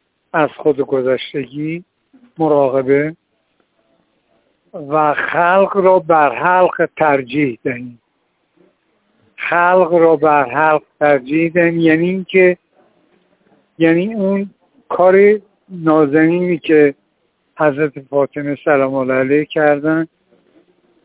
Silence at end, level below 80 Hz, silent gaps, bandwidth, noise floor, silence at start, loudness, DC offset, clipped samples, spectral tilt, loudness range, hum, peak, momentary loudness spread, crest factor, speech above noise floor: 1 s; -60 dBFS; none; 4 kHz; -65 dBFS; 0.35 s; -14 LUFS; under 0.1%; under 0.1%; -10.5 dB/octave; 5 LU; none; 0 dBFS; 12 LU; 14 dB; 51 dB